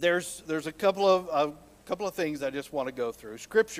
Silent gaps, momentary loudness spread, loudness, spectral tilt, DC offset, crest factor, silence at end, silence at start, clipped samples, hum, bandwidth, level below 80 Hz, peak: none; 10 LU; -29 LUFS; -4 dB/octave; under 0.1%; 18 dB; 0 s; 0 s; under 0.1%; none; 16 kHz; -64 dBFS; -10 dBFS